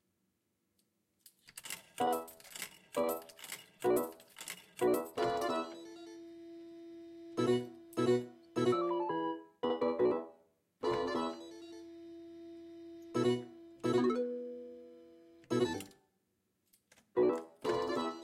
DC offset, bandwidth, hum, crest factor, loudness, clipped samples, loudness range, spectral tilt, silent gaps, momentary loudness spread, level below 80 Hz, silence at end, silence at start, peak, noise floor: under 0.1%; 16 kHz; none; 18 dB; -36 LUFS; under 0.1%; 4 LU; -5.5 dB/octave; none; 19 LU; -76 dBFS; 0 s; 1.55 s; -20 dBFS; -81 dBFS